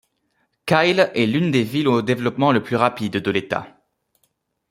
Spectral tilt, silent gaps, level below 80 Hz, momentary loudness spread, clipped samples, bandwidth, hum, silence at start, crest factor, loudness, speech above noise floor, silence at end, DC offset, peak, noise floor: -6.5 dB/octave; none; -60 dBFS; 7 LU; under 0.1%; 16 kHz; none; 0.65 s; 20 dB; -19 LUFS; 50 dB; 1.05 s; under 0.1%; -2 dBFS; -69 dBFS